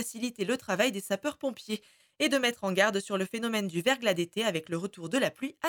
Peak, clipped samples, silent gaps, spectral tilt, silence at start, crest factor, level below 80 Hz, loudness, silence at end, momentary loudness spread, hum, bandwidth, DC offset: -10 dBFS; under 0.1%; none; -3.5 dB/octave; 0 s; 20 dB; -74 dBFS; -30 LUFS; 0 s; 9 LU; none; 19.5 kHz; under 0.1%